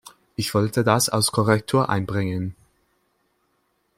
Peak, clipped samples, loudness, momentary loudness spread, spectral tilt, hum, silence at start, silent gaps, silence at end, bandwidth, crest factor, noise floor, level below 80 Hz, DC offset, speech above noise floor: -4 dBFS; under 0.1%; -21 LUFS; 10 LU; -4.5 dB/octave; none; 0.05 s; none; 1.45 s; 16.5 kHz; 20 dB; -69 dBFS; -56 dBFS; under 0.1%; 48 dB